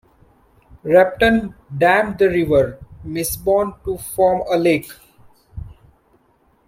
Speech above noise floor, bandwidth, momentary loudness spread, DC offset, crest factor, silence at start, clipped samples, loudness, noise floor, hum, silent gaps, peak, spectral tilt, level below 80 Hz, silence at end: 42 dB; 16.5 kHz; 20 LU; under 0.1%; 18 dB; 0.75 s; under 0.1%; -17 LUFS; -58 dBFS; none; none; -2 dBFS; -5 dB/octave; -42 dBFS; 0.95 s